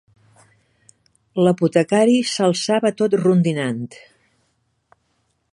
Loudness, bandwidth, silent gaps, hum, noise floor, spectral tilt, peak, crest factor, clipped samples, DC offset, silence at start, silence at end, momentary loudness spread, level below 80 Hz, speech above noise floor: -18 LUFS; 11.5 kHz; none; none; -68 dBFS; -6 dB/octave; -2 dBFS; 18 dB; under 0.1%; under 0.1%; 1.35 s; 1.6 s; 11 LU; -66 dBFS; 50 dB